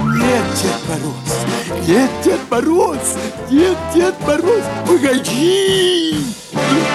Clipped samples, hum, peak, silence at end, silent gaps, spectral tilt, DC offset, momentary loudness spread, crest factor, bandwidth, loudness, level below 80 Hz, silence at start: under 0.1%; none; -2 dBFS; 0 s; none; -4.5 dB/octave; under 0.1%; 7 LU; 14 dB; 14 kHz; -15 LUFS; -42 dBFS; 0 s